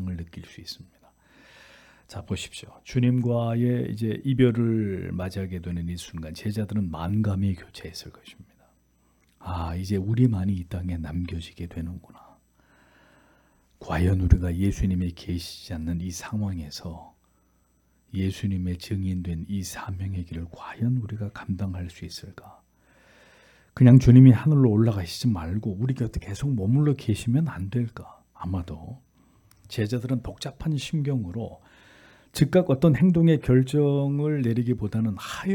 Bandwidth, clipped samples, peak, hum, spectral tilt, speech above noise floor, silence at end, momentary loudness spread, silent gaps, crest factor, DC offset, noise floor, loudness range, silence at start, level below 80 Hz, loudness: 17 kHz; under 0.1%; -2 dBFS; none; -7.5 dB/octave; 41 dB; 0 s; 18 LU; none; 22 dB; under 0.1%; -65 dBFS; 13 LU; 0 s; -42 dBFS; -25 LUFS